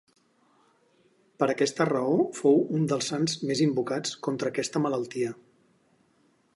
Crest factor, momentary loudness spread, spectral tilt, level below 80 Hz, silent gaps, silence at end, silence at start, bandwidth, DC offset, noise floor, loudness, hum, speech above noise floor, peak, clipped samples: 18 dB; 8 LU; -5 dB/octave; -74 dBFS; none; 1.2 s; 1.4 s; 11.5 kHz; under 0.1%; -66 dBFS; -27 LUFS; none; 40 dB; -10 dBFS; under 0.1%